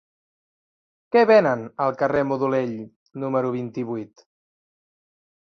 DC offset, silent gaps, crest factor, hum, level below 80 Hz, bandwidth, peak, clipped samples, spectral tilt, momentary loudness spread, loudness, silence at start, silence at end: under 0.1%; 2.96-3.06 s; 20 dB; none; -64 dBFS; 6.6 kHz; -4 dBFS; under 0.1%; -7.5 dB/octave; 17 LU; -22 LUFS; 1.15 s; 1.35 s